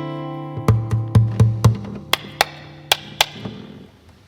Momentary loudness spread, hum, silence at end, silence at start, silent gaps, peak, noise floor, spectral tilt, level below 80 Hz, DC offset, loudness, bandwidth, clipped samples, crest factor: 18 LU; none; 0.45 s; 0 s; none; 0 dBFS; -45 dBFS; -5 dB/octave; -40 dBFS; under 0.1%; -20 LUFS; 17.5 kHz; under 0.1%; 20 dB